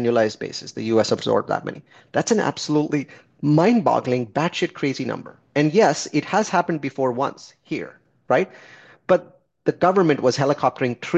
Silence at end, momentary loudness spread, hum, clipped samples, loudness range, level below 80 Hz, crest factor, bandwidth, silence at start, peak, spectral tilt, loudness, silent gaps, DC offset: 0 s; 13 LU; none; under 0.1%; 3 LU; -64 dBFS; 18 dB; 8.6 kHz; 0 s; -2 dBFS; -5.5 dB/octave; -21 LUFS; none; under 0.1%